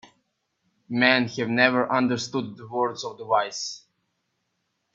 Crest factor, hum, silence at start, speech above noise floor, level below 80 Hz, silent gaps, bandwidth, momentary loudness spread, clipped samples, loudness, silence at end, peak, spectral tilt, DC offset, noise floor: 24 dB; none; 0.9 s; 52 dB; -70 dBFS; none; 7.8 kHz; 13 LU; under 0.1%; -24 LUFS; 1.15 s; -2 dBFS; -4 dB/octave; under 0.1%; -76 dBFS